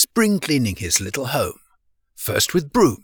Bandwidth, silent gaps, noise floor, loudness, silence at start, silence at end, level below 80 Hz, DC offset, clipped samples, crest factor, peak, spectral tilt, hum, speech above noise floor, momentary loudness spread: over 20 kHz; none; -63 dBFS; -20 LUFS; 0 s; 0.05 s; -46 dBFS; under 0.1%; under 0.1%; 18 dB; -2 dBFS; -3.5 dB/octave; none; 44 dB; 7 LU